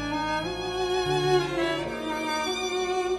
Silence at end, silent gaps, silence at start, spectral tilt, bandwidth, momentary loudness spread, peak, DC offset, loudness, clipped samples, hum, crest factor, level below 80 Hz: 0 s; none; 0 s; -4 dB/octave; 12.5 kHz; 6 LU; -12 dBFS; under 0.1%; -27 LUFS; under 0.1%; none; 16 dB; -48 dBFS